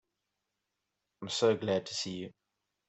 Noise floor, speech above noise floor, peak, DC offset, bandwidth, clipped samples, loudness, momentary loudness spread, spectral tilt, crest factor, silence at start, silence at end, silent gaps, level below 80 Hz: -86 dBFS; 54 dB; -14 dBFS; under 0.1%; 8.2 kHz; under 0.1%; -32 LUFS; 17 LU; -4 dB/octave; 22 dB; 1.2 s; 0.6 s; none; -78 dBFS